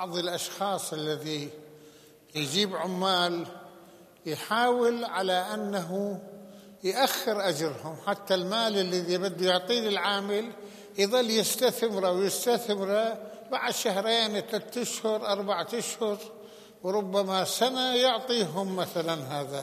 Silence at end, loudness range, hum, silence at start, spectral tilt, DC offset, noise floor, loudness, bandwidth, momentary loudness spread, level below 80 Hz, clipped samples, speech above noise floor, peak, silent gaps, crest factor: 0 s; 3 LU; none; 0 s; -3.5 dB/octave; under 0.1%; -54 dBFS; -28 LUFS; 15 kHz; 11 LU; -80 dBFS; under 0.1%; 26 dB; -10 dBFS; none; 18 dB